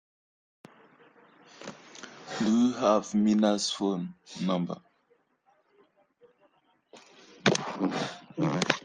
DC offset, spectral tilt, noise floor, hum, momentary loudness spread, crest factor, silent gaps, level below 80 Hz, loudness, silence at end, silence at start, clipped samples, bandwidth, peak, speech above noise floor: under 0.1%; -5 dB/octave; -69 dBFS; none; 21 LU; 26 dB; none; -72 dBFS; -28 LUFS; 0.05 s; 1.6 s; under 0.1%; 10 kHz; -4 dBFS; 42 dB